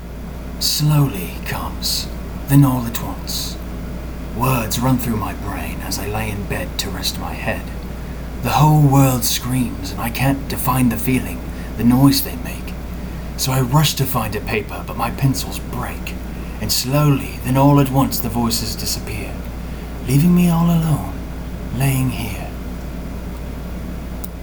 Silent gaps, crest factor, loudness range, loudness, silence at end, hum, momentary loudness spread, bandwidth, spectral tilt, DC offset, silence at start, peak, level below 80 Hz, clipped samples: none; 18 dB; 4 LU; -19 LUFS; 0 s; none; 16 LU; over 20 kHz; -5 dB/octave; under 0.1%; 0 s; 0 dBFS; -30 dBFS; under 0.1%